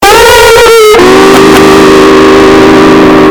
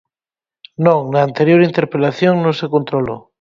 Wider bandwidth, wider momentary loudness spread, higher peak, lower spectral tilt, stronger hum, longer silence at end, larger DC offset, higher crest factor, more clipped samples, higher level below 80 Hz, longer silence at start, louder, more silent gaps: first, over 20 kHz vs 7.2 kHz; second, 1 LU vs 8 LU; about the same, 0 dBFS vs 0 dBFS; second, -4 dB/octave vs -8 dB/octave; neither; second, 0 s vs 0.25 s; neither; second, 0 dB vs 16 dB; first, 90% vs under 0.1%; first, -24 dBFS vs -54 dBFS; second, 0 s vs 0.8 s; first, -1 LUFS vs -15 LUFS; neither